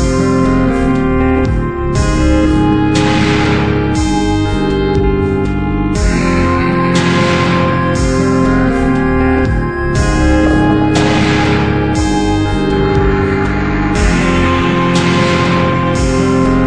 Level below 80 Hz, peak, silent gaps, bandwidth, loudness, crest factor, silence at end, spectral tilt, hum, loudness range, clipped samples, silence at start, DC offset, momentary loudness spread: -20 dBFS; 0 dBFS; none; 10.5 kHz; -12 LUFS; 12 dB; 0 s; -6 dB/octave; none; 1 LU; under 0.1%; 0 s; 1%; 3 LU